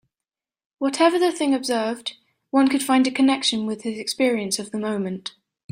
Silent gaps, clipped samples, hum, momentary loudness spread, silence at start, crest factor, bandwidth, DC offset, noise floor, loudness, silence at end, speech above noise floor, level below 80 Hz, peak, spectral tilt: none; under 0.1%; none; 10 LU; 0.8 s; 18 dB; 16 kHz; under 0.1%; -89 dBFS; -22 LUFS; 0.4 s; 68 dB; -68 dBFS; -4 dBFS; -3.5 dB/octave